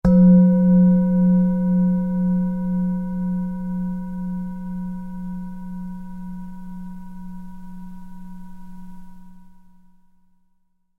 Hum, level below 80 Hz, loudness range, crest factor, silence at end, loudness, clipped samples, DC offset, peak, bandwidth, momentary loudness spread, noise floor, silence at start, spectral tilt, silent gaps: none; -42 dBFS; 23 LU; 16 dB; 1.4 s; -19 LUFS; under 0.1%; under 0.1%; -6 dBFS; 1.7 kHz; 25 LU; -63 dBFS; 0.05 s; -12 dB/octave; none